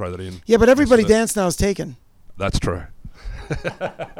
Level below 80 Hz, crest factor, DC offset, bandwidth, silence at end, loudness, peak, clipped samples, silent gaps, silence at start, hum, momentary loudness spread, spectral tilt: -34 dBFS; 16 dB; under 0.1%; 16.5 kHz; 0.1 s; -18 LUFS; -2 dBFS; under 0.1%; none; 0 s; none; 18 LU; -5 dB/octave